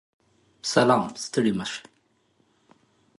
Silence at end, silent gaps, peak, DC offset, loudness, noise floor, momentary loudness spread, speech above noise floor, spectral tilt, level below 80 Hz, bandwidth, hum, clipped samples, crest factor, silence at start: 1.4 s; none; -4 dBFS; under 0.1%; -24 LUFS; -67 dBFS; 14 LU; 44 dB; -4.5 dB/octave; -64 dBFS; 11.5 kHz; none; under 0.1%; 24 dB; 0.65 s